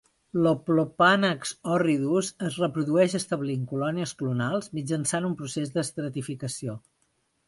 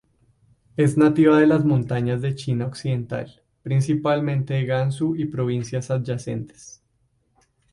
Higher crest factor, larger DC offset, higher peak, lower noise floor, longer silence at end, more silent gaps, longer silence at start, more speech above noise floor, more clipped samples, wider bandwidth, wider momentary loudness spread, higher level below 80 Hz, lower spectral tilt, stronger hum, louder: about the same, 20 dB vs 18 dB; neither; second, -8 dBFS vs -4 dBFS; first, -72 dBFS vs -67 dBFS; second, 0.7 s vs 1.05 s; neither; second, 0.35 s vs 0.8 s; about the same, 46 dB vs 46 dB; neither; about the same, 11.5 kHz vs 11.5 kHz; second, 11 LU vs 15 LU; second, -66 dBFS vs -56 dBFS; second, -5 dB/octave vs -7.5 dB/octave; neither; second, -26 LUFS vs -22 LUFS